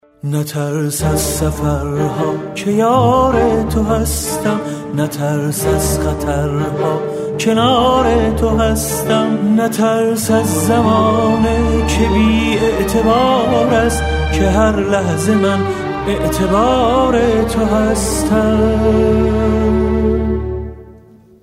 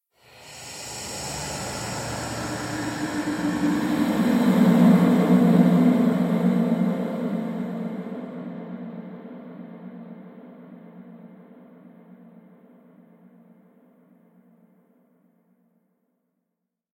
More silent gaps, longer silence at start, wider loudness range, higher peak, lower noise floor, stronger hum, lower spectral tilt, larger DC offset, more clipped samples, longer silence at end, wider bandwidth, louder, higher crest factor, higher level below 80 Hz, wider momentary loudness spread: neither; second, 0.25 s vs 0.4 s; second, 3 LU vs 22 LU; first, 0 dBFS vs -6 dBFS; second, -42 dBFS vs -82 dBFS; neither; about the same, -5.5 dB/octave vs -6.5 dB/octave; neither; neither; second, 0.5 s vs 5.1 s; about the same, 16 kHz vs 16 kHz; first, -14 LUFS vs -22 LUFS; second, 12 dB vs 20 dB; first, -24 dBFS vs -56 dBFS; second, 7 LU vs 25 LU